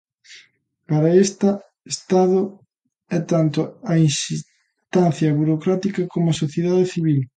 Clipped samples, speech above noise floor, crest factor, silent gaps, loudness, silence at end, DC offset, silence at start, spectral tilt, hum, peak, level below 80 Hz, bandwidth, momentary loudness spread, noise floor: under 0.1%; 38 dB; 16 dB; none; -20 LUFS; 0.1 s; under 0.1%; 0.3 s; -6.5 dB/octave; none; -4 dBFS; -62 dBFS; 9.4 kHz; 10 LU; -57 dBFS